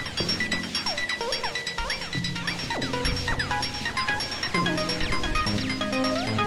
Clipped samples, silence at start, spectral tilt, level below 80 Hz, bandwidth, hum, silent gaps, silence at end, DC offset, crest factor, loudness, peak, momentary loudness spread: under 0.1%; 0 s; -3.5 dB/octave; -40 dBFS; 16.5 kHz; none; none; 0 s; under 0.1%; 16 dB; -27 LUFS; -10 dBFS; 3 LU